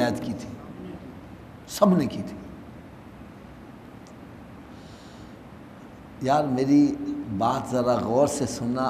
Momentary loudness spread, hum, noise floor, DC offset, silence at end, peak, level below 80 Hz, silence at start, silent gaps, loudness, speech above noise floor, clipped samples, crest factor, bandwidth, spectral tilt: 24 LU; none; -44 dBFS; under 0.1%; 0 s; -4 dBFS; -54 dBFS; 0 s; none; -24 LUFS; 22 dB; under 0.1%; 22 dB; 15 kHz; -6 dB/octave